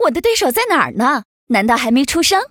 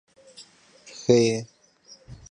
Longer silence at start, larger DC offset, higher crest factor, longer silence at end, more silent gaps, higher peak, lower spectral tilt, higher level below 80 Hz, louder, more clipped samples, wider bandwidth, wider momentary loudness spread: second, 0 s vs 0.4 s; neither; second, 14 dB vs 22 dB; about the same, 0.05 s vs 0.15 s; first, 1.25-1.47 s vs none; first, 0 dBFS vs -4 dBFS; second, -3 dB/octave vs -5.5 dB/octave; first, -46 dBFS vs -60 dBFS; first, -15 LUFS vs -23 LUFS; neither; first, over 20 kHz vs 10 kHz; second, 3 LU vs 26 LU